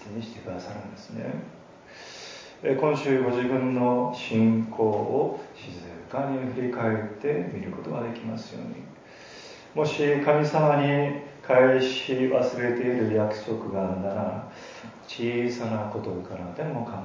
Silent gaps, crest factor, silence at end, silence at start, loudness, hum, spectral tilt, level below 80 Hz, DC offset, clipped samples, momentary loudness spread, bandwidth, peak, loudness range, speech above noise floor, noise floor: none; 20 dB; 0 s; 0 s; -26 LUFS; none; -7 dB/octave; -62 dBFS; under 0.1%; under 0.1%; 19 LU; 7.6 kHz; -8 dBFS; 8 LU; 21 dB; -46 dBFS